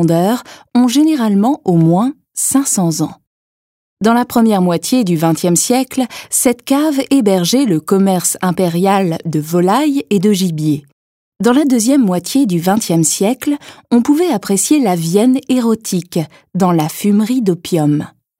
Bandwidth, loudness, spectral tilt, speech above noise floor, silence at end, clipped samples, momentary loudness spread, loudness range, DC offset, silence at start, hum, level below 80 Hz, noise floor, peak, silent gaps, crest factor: 16.5 kHz; -14 LUFS; -5 dB/octave; over 77 dB; 0.3 s; under 0.1%; 7 LU; 1 LU; under 0.1%; 0 s; none; -58 dBFS; under -90 dBFS; 0 dBFS; 3.27-3.97 s, 10.92-11.32 s; 14 dB